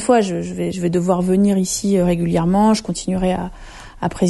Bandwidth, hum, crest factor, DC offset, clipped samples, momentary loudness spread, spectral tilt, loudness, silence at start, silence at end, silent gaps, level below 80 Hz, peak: 12 kHz; none; 14 dB; under 0.1%; under 0.1%; 10 LU; -6 dB/octave; -18 LUFS; 0 s; 0 s; none; -38 dBFS; -4 dBFS